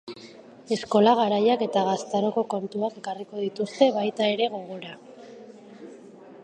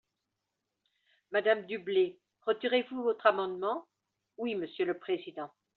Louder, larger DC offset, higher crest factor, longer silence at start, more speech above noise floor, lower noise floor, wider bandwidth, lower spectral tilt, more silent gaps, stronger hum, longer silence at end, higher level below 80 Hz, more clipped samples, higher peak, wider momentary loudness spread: first, -24 LUFS vs -32 LUFS; neither; about the same, 20 dB vs 22 dB; second, 0.05 s vs 1.3 s; second, 23 dB vs 55 dB; second, -47 dBFS vs -86 dBFS; first, 9.6 kHz vs 4.5 kHz; first, -5.5 dB/octave vs -2 dB/octave; neither; neither; second, 0 s vs 0.3 s; first, -76 dBFS vs -82 dBFS; neither; first, -4 dBFS vs -10 dBFS; first, 25 LU vs 11 LU